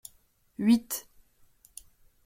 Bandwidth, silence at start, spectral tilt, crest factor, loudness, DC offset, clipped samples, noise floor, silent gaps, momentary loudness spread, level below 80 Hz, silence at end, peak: 16.5 kHz; 0.6 s; -4.5 dB/octave; 20 dB; -28 LUFS; under 0.1%; under 0.1%; -65 dBFS; none; 24 LU; -66 dBFS; 1.25 s; -12 dBFS